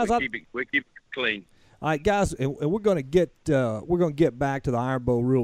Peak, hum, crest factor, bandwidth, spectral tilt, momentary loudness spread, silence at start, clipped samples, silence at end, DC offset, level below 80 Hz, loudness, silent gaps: -8 dBFS; none; 16 dB; 13.5 kHz; -6.5 dB/octave; 5 LU; 0 s; under 0.1%; 0 s; under 0.1%; -46 dBFS; -25 LUFS; none